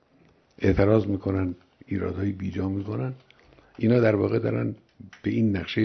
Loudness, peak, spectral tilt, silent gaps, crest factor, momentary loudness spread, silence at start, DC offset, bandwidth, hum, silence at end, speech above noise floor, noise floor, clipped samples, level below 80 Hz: -26 LUFS; -6 dBFS; -9 dB/octave; none; 20 dB; 12 LU; 0.6 s; under 0.1%; 6.4 kHz; none; 0 s; 36 dB; -60 dBFS; under 0.1%; -48 dBFS